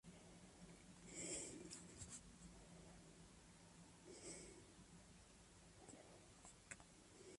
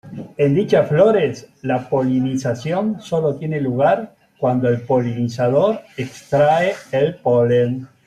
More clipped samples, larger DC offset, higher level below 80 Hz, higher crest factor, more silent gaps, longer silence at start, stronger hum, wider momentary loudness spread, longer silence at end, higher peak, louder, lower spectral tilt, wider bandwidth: neither; neither; second, -74 dBFS vs -58 dBFS; first, 22 dB vs 16 dB; neither; about the same, 0.05 s vs 0.05 s; neither; first, 14 LU vs 8 LU; second, 0 s vs 0.2 s; second, -38 dBFS vs -2 dBFS; second, -59 LUFS vs -18 LUFS; second, -3 dB/octave vs -7.5 dB/octave; about the same, 11.5 kHz vs 12.5 kHz